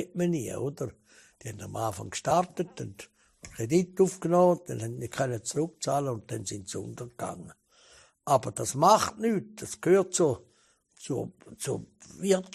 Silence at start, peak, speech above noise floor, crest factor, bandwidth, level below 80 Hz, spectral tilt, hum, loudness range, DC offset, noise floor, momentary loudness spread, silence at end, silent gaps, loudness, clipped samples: 0 s; -6 dBFS; 37 dB; 22 dB; 14 kHz; -64 dBFS; -5 dB/octave; none; 7 LU; under 0.1%; -66 dBFS; 18 LU; 0.05 s; none; -29 LUFS; under 0.1%